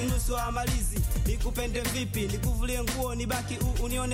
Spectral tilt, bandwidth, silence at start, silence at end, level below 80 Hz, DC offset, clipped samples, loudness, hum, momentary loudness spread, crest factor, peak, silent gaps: -4.5 dB/octave; 16.5 kHz; 0 s; 0 s; -32 dBFS; under 0.1%; under 0.1%; -30 LUFS; none; 2 LU; 12 dB; -16 dBFS; none